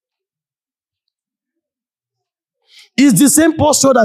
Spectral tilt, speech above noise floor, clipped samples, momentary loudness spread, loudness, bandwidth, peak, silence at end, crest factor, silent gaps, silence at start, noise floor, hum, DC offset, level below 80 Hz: -4 dB/octave; over 79 dB; under 0.1%; 4 LU; -10 LUFS; 15.5 kHz; 0 dBFS; 0 s; 16 dB; none; 3 s; under -90 dBFS; none; under 0.1%; -50 dBFS